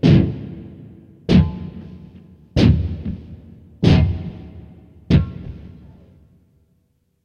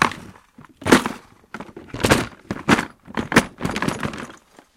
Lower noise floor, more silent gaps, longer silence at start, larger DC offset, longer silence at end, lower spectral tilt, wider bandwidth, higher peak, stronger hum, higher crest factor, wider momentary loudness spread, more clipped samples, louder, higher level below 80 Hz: first, -64 dBFS vs -48 dBFS; neither; about the same, 0.05 s vs 0 s; neither; first, 1.55 s vs 0.45 s; first, -8.5 dB/octave vs -4.5 dB/octave; second, 7 kHz vs 17 kHz; about the same, 0 dBFS vs 0 dBFS; neither; about the same, 20 dB vs 22 dB; first, 24 LU vs 20 LU; neither; first, -18 LUFS vs -21 LUFS; first, -30 dBFS vs -44 dBFS